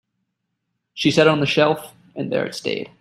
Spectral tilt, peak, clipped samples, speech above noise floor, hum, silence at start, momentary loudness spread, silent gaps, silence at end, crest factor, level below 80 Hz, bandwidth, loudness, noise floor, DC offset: -5 dB/octave; -2 dBFS; under 0.1%; 57 dB; none; 0.95 s; 15 LU; none; 0.15 s; 20 dB; -60 dBFS; 15 kHz; -19 LUFS; -76 dBFS; under 0.1%